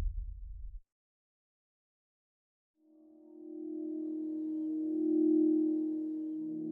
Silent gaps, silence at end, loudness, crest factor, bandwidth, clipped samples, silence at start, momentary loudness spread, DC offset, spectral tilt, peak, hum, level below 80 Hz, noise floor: 0.92-2.74 s; 0 s; -34 LUFS; 16 dB; 1 kHz; under 0.1%; 0 s; 21 LU; under 0.1%; -12.5 dB/octave; -20 dBFS; none; -50 dBFS; -61 dBFS